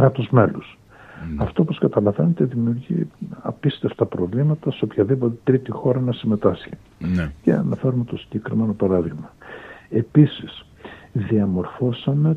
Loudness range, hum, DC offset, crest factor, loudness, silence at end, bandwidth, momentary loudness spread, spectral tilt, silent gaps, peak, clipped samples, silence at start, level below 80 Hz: 1 LU; none; under 0.1%; 20 dB; -21 LUFS; 0 s; 4.7 kHz; 16 LU; -10 dB/octave; none; -2 dBFS; under 0.1%; 0 s; -46 dBFS